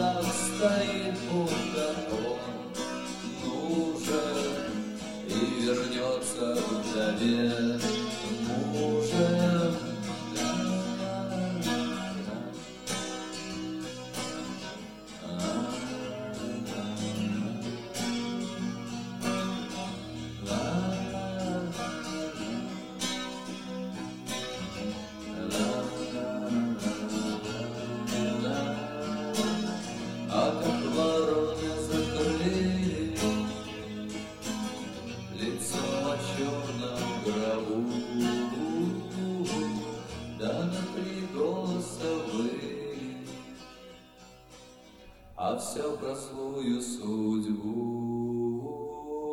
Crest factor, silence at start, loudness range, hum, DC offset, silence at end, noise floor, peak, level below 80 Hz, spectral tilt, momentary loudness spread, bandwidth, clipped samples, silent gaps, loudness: 18 dB; 0 s; 7 LU; none; under 0.1%; 0 s; -53 dBFS; -14 dBFS; -56 dBFS; -5 dB/octave; 10 LU; 16.5 kHz; under 0.1%; none; -32 LUFS